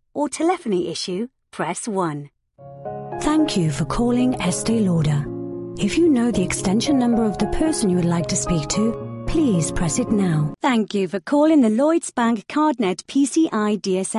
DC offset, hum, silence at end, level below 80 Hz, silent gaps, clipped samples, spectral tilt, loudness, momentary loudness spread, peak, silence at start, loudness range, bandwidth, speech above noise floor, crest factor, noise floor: under 0.1%; none; 0 s; -40 dBFS; none; under 0.1%; -5.5 dB/octave; -20 LUFS; 9 LU; -6 dBFS; 0.15 s; 5 LU; 11.5 kHz; 22 dB; 14 dB; -42 dBFS